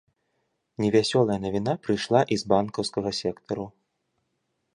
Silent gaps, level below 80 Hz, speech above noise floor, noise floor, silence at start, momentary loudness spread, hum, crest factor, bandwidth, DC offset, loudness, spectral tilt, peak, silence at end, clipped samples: none; -58 dBFS; 52 dB; -77 dBFS; 0.8 s; 11 LU; none; 22 dB; 11 kHz; under 0.1%; -25 LUFS; -5.5 dB/octave; -6 dBFS; 1.05 s; under 0.1%